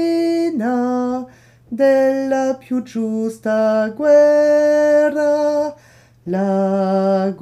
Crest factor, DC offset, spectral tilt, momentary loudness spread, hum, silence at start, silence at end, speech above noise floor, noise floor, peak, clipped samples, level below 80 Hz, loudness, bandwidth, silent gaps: 12 dB; under 0.1%; -7 dB/octave; 11 LU; none; 0 s; 0.05 s; 24 dB; -40 dBFS; -4 dBFS; under 0.1%; -62 dBFS; -16 LUFS; 12.5 kHz; none